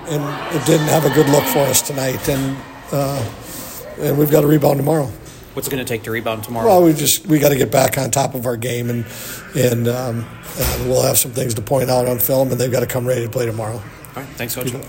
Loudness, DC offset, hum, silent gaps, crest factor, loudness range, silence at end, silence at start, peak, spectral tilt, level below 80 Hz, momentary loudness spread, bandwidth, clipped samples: -17 LUFS; under 0.1%; none; none; 18 dB; 3 LU; 0 s; 0 s; 0 dBFS; -5 dB/octave; -40 dBFS; 14 LU; 17 kHz; under 0.1%